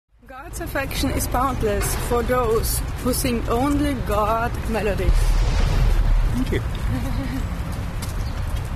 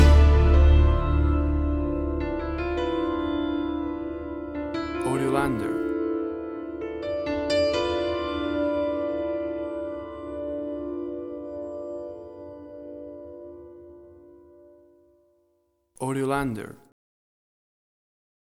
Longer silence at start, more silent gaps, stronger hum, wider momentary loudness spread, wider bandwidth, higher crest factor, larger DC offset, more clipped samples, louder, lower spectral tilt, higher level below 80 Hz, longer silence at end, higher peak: first, 0.25 s vs 0 s; neither; neither; second, 8 LU vs 19 LU; first, 13.5 kHz vs 11.5 kHz; second, 14 dB vs 20 dB; neither; neither; first, -23 LUFS vs -26 LUFS; second, -5.5 dB/octave vs -7.5 dB/octave; about the same, -24 dBFS vs -28 dBFS; second, 0 s vs 1.75 s; about the same, -6 dBFS vs -6 dBFS